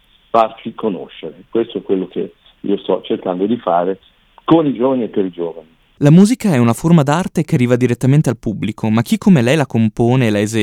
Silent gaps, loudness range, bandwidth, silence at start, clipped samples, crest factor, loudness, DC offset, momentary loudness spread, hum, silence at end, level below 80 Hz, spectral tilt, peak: none; 6 LU; 14.5 kHz; 0.35 s; under 0.1%; 14 dB; -15 LUFS; under 0.1%; 12 LU; none; 0 s; -48 dBFS; -7 dB/octave; 0 dBFS